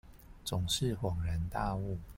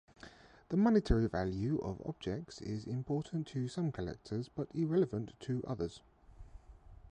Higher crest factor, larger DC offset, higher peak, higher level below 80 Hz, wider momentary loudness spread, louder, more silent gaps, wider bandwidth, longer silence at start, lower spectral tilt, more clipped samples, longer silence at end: about the same, 16 dB vs 20 dB; neither; second, -20 dBFS vs -16 dBFS; about the same, -46 dBFS vs -50 dBFS; second, 6 LU vs 12 LU; about the same, -35 LUFS vs -37 LUFS; neither; first, 16.5 kHz vs 9.6 kHz; second, 0.05 s vs 0.25 s; second, -5 dB/octave vs -8 dB/octave; neither; about the same, 0 s vs 0 s